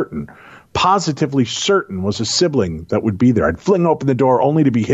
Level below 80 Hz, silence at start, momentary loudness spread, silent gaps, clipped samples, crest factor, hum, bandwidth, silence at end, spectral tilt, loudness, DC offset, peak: -44 dBFS; 0 s; 7 LU; none; under 0.1%; 12 dB; none; 8.2 kHz; 0 s; -5.5 dB/octave; -16 LUFS; under 0.1%; -4 dBFS